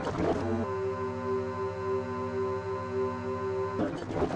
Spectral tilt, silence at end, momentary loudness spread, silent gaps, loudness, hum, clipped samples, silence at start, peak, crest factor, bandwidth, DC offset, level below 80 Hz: -7.5 dB/octave; 0 s; 4 LU; none; -32 LUFS; none; under 0.1%; 0 s; -16 dBFS; 16 dB; 9 kHz; under 0.1%; -54 dBFS